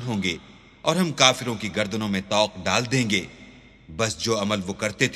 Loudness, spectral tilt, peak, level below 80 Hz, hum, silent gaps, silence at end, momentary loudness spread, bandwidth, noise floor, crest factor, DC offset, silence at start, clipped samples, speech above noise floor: -23 LUFS; -3.5 dB/octave; 0 dBFS; -54 dBFS; none; none; 0 s; 10 LU; 14 kHz; -48 dBFS; 24 dB; under 0.1%; 0 s; under 0.1%; 24 dB